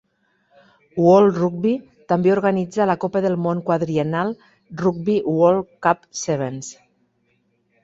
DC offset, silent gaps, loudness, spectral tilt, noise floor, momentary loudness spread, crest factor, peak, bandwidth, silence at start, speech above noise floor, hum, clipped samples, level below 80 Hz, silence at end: under 0.1%; none; -19 LUFS; -6.5 dB/octave; -66 dBFS; 13 LU; 18 dB; -2 dBFS; 8 kHz; 0.95 s; 47 dB; none; under 0.1%; -60 dBFS; 1.1 s